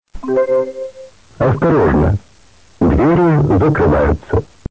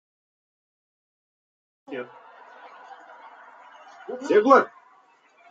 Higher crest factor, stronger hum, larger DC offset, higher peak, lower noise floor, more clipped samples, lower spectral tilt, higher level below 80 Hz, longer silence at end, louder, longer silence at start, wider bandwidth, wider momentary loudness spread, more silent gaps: second, 10 dB vs 26 dB; neither; first, 0.4% vs under 0.1%; about the same, -4 dBFS vs -2 dBFS; second, -48 dBFS vs -58 dBFS; neither; first, -9.5 dB/octave vs -5 dB/octave; first, -26 dBFS vs -84 dBFS; second, 0.25 s vs 0.85 s; first, -14 LUFS vs -20 LUFS; second, 0.15 s vs 1.9 s; about the same, 8 kHz vs 7.8 kHz; second, 9 LU vs 29 LU; neither